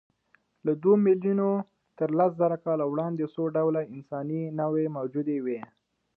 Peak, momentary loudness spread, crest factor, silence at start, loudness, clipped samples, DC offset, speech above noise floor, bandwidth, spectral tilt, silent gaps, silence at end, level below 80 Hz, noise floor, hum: -10 dBFS; 11 LU; 16 dB; 0.65 s; -27 LUFS; under 0.1%; under 0.1%; 42 dB; 3.9 kHz; -12.5 dB/octave; none; 0.55 s; -78 dBFS; -68 dBFS; none